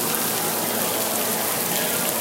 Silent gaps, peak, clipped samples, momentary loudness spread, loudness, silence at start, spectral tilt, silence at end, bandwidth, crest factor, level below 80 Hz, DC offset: none; 0 dBFS; under 0.1%; 1 LU; -21 LUFS; 0 s; -1.5 dB/octave; 0 s; 17 kHz; 22 dB; -62 dBFS; under 0.1%